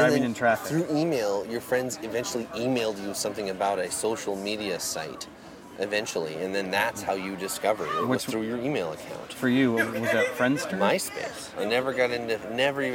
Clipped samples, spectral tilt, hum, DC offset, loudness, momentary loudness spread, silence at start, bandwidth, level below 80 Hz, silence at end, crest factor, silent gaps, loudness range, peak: under 0.1%; -4 dB/octave; none; under 0.1%; -27 LUFS; 8 LU; 0 s; 17 kHz; -64 dBFS; 0 s; 20 dB; none; 4 LU; -8 dBFS